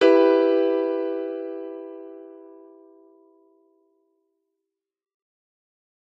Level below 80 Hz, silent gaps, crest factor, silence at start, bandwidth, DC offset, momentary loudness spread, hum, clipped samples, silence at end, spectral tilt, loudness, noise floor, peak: under -90 dBFS; none; 22 dB; 0 s; 7.2 kHz; under 0.1%; 25 LU; none; under 0.1%; 3.65 s; -4.5 dB/octave; -22 LUFS; -84 dBFS; -4 dBFS